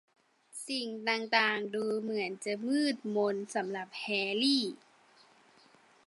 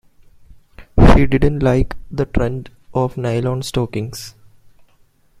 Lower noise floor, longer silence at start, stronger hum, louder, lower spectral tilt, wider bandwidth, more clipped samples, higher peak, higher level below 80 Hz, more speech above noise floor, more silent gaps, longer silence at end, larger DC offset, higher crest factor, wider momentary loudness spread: first, -63 dBFS vs -54 dBFS; second, 0.55 s vs 0.8 s; neither; second, -32 LUFS vs -18 LUFS; second, -3.5 dB/octave vs -7 dB/octave; second, 11.5 kHz vs 14.5 kHz; neither; second, -12 dBFS vs 0 dBFS; second, -88 dBFS vs -24 dBFS; second, 30 dB vs 36 dB; neither; first, 1.3 s vs 1.1 s; neither; first, 22 dB vs 16 dB; second, 10 LU vs 15 LU